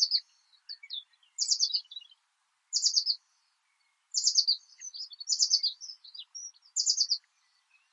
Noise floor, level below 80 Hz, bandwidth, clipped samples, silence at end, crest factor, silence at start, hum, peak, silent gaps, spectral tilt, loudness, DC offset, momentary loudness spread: -76 dBFS; under -90 dBFS; 10.5 kHz; under 0.1%; 0.75 s; 22 dB; 0 s; none; -10 dBFS; none; 12 dB/octave; -27 LUFS; under 0.1%; 19 LU